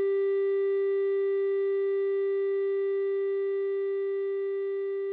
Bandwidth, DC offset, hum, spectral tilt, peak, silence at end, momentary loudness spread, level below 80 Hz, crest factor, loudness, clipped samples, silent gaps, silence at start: 4.2 kHz; under 0.1%; none; -7 dB/octave; -22 dBFS; 0 s; 4 LU; under -90 dBFS; 6 dB; -28 LUFS; under 0.1%; none; 0 s